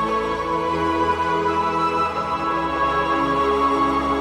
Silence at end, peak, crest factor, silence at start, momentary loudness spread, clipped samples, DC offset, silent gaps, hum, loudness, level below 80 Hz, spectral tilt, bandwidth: 0 s; -10 dBFS; 12 dB; 0 s; 4 LU; under 0.1%; under 0.1%; none; none; -20 LUFS; -42 dBFS; -5.5 dB/octave; 14 kHz